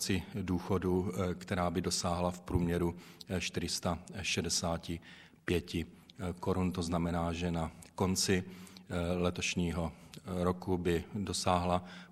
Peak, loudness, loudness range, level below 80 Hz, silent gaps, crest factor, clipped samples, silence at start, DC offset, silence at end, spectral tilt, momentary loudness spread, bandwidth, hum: -14 dBFS; -35 LUFS; 2 LU; -52 dBFS; none; 20 dB; under 0.1%; 0 s; under 0.1%; 0 s; -4.5 dB/octave; 10 LU; 15 kHz; none